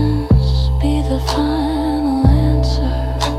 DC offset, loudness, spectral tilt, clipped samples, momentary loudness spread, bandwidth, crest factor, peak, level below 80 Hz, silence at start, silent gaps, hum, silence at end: under 0.1%; -16 LUFS; -7 dB/octave; under 0.1%; 4 LU; 13 kHz; 14 dB; 0 dBFS; -18 dBFS; 0 s; none; none; 0 s